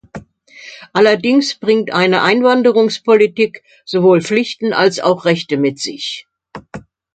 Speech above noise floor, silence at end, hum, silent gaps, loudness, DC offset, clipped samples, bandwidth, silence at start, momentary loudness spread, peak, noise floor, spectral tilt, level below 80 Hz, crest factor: 26 dB; 0.35 s; none; none; -14 LUFS; under 0.1%; under 0.1%; 9.2 kHz; 0.15 s; 22 LU; 0 dBFS; -39 dBFS; -5 dB/octave; -58 dBFS; 14 dB